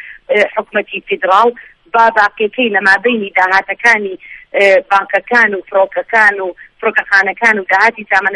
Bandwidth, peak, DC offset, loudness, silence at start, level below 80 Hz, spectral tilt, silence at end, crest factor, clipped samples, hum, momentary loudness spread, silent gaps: 11.5 kHz; 0 dBFS; under 0.1%; -11 LUFS; 0.05 s; -56 dBFS; -3.5 dB/octave; 0 s; 12 dB; 0.1%; none; 8 LU; none